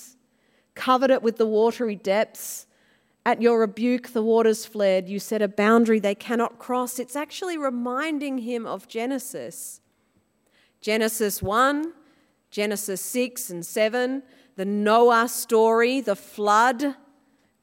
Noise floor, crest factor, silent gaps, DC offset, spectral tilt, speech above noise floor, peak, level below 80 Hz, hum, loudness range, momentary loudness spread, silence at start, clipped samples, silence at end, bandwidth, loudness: -67 dBFS; 18 dB; none; under 0.1%; -4 dB/octave; 44 dB; -6 dBFS; -62 dBFS; none; 8 LU; 13 LU; 0 s; under 0.1%; 0.7 s; 16.5 kHz; -23 LUFS